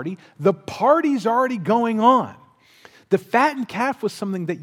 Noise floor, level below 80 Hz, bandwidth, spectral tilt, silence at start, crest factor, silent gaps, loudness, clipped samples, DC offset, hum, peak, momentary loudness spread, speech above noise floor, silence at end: -51 dBFS; -66 dBFS; 16 kHz; -6.5 dB/octave; 0 s; 20 dB; none; -20 LUFS; under 0.1%; under 0.1%; none; -2 dBFS; 9 LU; 31 dB; 0 s